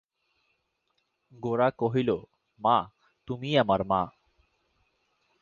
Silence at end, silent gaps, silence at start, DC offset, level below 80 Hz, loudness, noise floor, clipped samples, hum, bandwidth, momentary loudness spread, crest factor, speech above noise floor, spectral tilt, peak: 1.3 s; none; 1.4 s; under 0.1%; -60 dBFS; -27 LUFS; -76 dBFS; under 0.1%; none; 7.2 kHz; 12 LU; 20 dB; 50 dB; -7.5 dB/octave; -10 dBFS